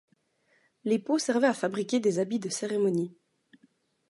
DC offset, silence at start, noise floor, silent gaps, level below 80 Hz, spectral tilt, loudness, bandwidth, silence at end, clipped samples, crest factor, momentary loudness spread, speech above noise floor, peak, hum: under 0.1%; 0.85 s; -70 dBFS; none; -80 dBFS; -5 dB/octave; -28 LUFS; 11.5 kHz; 1 s; under 0.1%; 18 dB; 6 LU; 42 dB; -12 dBFS; none